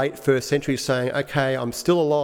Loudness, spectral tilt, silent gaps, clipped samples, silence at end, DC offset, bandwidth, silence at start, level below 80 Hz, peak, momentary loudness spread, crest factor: -22 LUFS; -5 dB/octave; none; under 0.1%; 0 s; under 0.1%; 18 kHz; 0 s; -56 dBFS; -6 dBFS; 3 LU; 14 dB